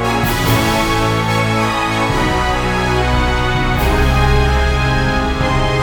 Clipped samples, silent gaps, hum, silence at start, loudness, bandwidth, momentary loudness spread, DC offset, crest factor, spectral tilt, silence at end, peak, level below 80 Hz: under 0.1%; none; none; 0 s; -15 LUFS; 19 kHz; 2 LU; under 0.1%; 12 dB; -5 dB/octave; 0 s; -2 dBFS; -20 dBFS